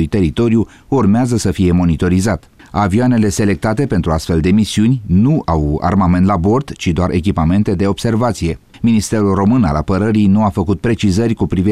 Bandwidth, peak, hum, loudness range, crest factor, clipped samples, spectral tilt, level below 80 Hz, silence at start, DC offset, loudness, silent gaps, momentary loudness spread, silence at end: 13.5 kHz; -4 dBFS; none; 1 LU; 10 dB; under 0.1%; -7 dB/octave; -30 dBFS; 0 s; 0.6%; -14 LUFS; none; 4 LU; 0 s